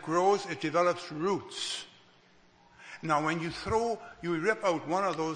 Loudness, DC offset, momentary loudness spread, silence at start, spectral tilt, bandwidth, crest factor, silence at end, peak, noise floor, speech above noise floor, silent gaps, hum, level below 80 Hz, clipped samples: -31 LUFS; under 0.1%; 9 LU; 0 s; -4.5 dB/octave; 9.8 kHz; 18 dB; 0 s; -14 dBFS; -61 dBFS; 31 dB; none; none; -60 dBFS; under 0.1%